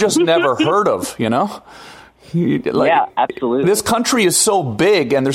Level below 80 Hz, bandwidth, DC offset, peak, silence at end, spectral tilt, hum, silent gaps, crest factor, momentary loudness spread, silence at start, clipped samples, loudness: -52 dBFS; 16 kHz; under 0.1%; -2 dBFS; 0 s; -4 dB/octave; none; none; 14 dB; 6 LU; 0 s; under 0.1%; -15 LUFS